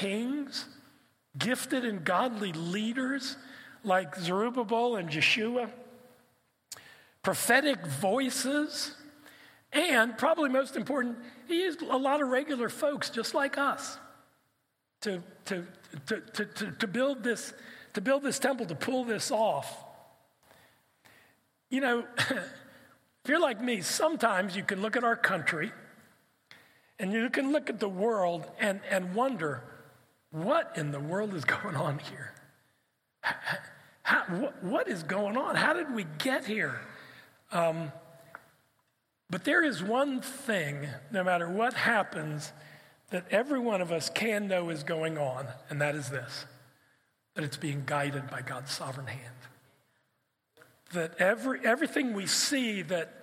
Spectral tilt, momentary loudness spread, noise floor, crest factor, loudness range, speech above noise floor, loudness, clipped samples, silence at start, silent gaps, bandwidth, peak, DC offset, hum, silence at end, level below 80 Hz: -4 dB/octave; 14 LU; -79 dBFS; 24 dB; 6 LU; 48 dB; -31 LUFS; under 0.1%; 0 s; none; 16.5 kHz; -8 dBFS; under 0.1%; none; 0 s; -80 dBFS